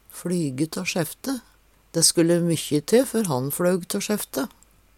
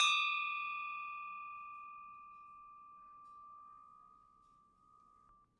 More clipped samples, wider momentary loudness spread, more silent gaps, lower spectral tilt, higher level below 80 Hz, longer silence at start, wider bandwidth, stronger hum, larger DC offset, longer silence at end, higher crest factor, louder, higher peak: neither; second, 12 LU vs 23 LU; neither; first, -4 dB/octave vs 3.5 dB/octave; first, -60 dBFS vs -84 dBFS; first, 0.15 s vs 0 s; first, 18 kHz vs 10.5 kHz; neither; neither; second, 0.5 s vs 1.55 s; about the same, 20 dB vs 24 dB; first, -23 LUFS vs -39 LUFS; first, -4 dBFS vs -18 dBFS